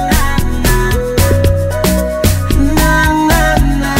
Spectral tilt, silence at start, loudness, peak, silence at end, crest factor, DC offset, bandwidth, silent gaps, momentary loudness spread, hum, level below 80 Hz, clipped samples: -5 dB/octave; 0 s; -12 LUFS; 0 dBFS; 0 s; 10 dB; under 0.1%; 16.5 kHz; none; 3 LU; none; -16 dBFS; under 0.1%